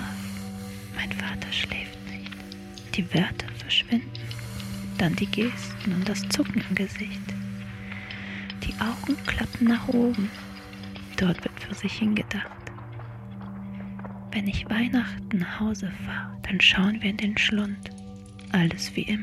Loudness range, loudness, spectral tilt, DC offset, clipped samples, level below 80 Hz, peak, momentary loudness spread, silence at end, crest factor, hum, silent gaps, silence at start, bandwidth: 6 LU; -27 LUFS; -5 dB/octave; under 0.1%; under 0.1%; -48 dBFS; -6 dBFS; 16 LU; 0 s; 22 dB; none; none; 0 s; 15 kHz